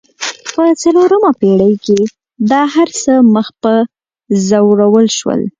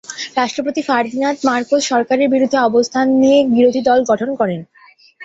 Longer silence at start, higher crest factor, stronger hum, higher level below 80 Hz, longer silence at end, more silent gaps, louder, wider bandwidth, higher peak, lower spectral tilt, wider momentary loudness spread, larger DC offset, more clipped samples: about the same, 0.2 s vs 0.1 s; about the same, 10 dB vs 14 dB; neither; first, -52 dBFS vs -58 dBFS; about the same, 0.1 s vs 0 s; neither; first, -11 LUFS vs -15 LUFS; first, 9.4 kHz vs 8 kHz; about the same, 0 dBFS vs -2 dBFS; about the same, -5.5 dB/octave vs -4.5 dB/octave; about the same, 9 LU vs 8 LU; neither; neither